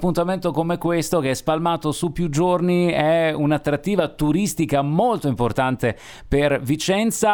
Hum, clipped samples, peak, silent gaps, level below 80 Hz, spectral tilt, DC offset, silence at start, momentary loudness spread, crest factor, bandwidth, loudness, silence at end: none; under 0.1%; -4 dBFS; none; -40 dBFS; -5.5 dB/octave; under 0.1%; 0 s; 4 LU; 16 dB; over 20 kHz; -21 LUFS; 0 s